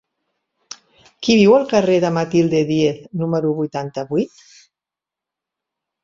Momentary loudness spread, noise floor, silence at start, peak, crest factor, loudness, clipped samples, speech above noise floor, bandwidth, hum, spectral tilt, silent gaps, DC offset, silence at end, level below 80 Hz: 19 LU; -87 dBFS; 0.7 s; -2 dBFS; 18 dB; -17 LUFS; under 0.1%; 71 dB; 7.6 kHz; none; -6 dB/octave; none; under 0.1%; 1.75 s; -56 dBFS